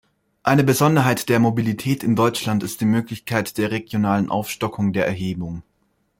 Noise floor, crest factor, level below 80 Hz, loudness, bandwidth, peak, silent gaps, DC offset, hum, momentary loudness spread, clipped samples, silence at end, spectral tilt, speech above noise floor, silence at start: -67 dBFS; 18 dB; -54 dBFS; -20 LUFS; 16.5 kHz; -2 dBFS; none; under 0.1%; none; 10 LU; under 0.1%; 0.6 s; -6 dB/octave; 47 dB; 0.45 s